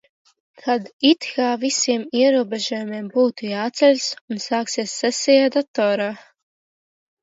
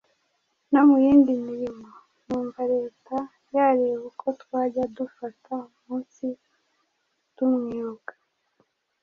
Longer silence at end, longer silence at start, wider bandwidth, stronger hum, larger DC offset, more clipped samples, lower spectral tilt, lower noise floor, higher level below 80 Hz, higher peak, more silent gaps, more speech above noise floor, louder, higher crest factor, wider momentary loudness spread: about the same, 1 s vs 1.05 s; about the same, 0.65 s vs 0.7 s; first, 8 kHz vs 6.4 kHz; neither; neither; neither; second, -3 dB/octave vs -8 dB/octave; first, under -90 dBFS vs -74 dBFS; second, -74 dBFS vs -64 dBFS; about the same, -4 dBFS vs -6 dBFS; first, 0.93-0.99 s, 4.21-4.28 s, 5.68-5.74 s vs none; first, over 70 dB vs 53 dB; first, -20 LUFS vs -25 LUFS; about the same, 18 dB vs 18 dB; second, 9 LU vs 18 LU